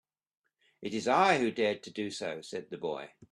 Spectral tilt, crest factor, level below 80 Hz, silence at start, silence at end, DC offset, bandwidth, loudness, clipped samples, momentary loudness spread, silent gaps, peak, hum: -4.5 dB/octave; 22 dB; -76 dBFS; 0.8 s; 0.05 s; under 0.1%; 12 kHz; -31 LUFS; under 0.1%; 15 LU; none; -10 dBFS; none